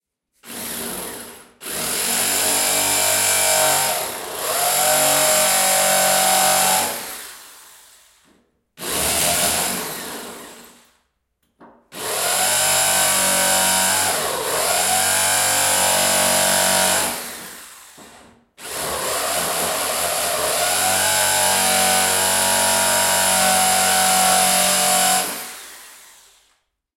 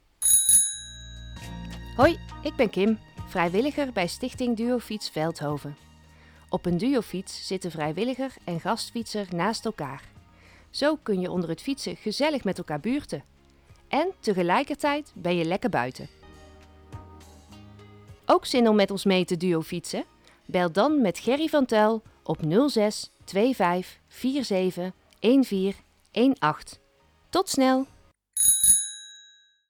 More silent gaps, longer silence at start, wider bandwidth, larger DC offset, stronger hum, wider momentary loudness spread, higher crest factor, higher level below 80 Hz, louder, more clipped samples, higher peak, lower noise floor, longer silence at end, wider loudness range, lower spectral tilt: neither; first, 0.45 s vs 0.2 s; second, 16.5 kHz vs 19.5 kHz; neither; neither; about the same, 15 LU vs 16 LU; about the same, 16 dB vs 20 dB; about the same, -54 dBFS vs -52 dBFS; first, -16 LUFS vs -25 LUFS; neither; about the same, -4 dBFS vs -6 dBFS; first, -70 dBFS vs -62 dBFS; first, 1 s vs 0.5 s; about the same, 7 LU vs 6 LU; second, 0 dB/octave vs -3.5 dB/octave